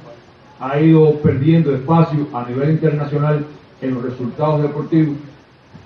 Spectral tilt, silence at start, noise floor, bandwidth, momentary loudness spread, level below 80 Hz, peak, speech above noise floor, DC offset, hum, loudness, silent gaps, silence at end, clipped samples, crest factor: -10.5 dB/octave; 0.05 s; -43 dBFS; 5.2 kHz; 12 LU; -52 dBFS; -2 dBFS; 28 dB; under 0.1%; none; -16 LUFS; none; 0.1 s; under 0.1%; 14 dB